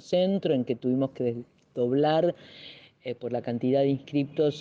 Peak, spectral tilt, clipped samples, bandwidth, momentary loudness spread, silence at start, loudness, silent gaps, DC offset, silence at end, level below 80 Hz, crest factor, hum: -12 dBFS; -8 dB/octave; under 0.1%; 7.6 kHz; 16 LU; 0.05 s; -27 LUFS; none; under 0.1%; 0 s; -72 dBFS; 14 dB; none